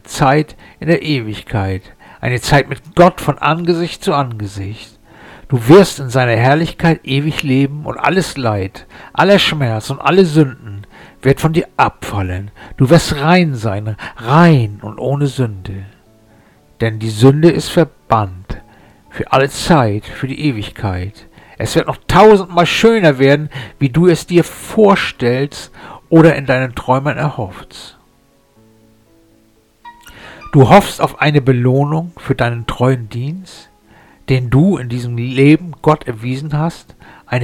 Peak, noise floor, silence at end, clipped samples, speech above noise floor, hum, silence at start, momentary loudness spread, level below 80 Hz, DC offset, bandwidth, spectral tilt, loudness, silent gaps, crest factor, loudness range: 0 dBFS; -52 dBFS; 0 s; 0.1%; 39 dB; none; 0.1 s; 16 LU; -38 dBFS; under 0.1%; 18 kHz; -6.5 dB/octave; -13 LUFS; none; 14 dB; 5 LU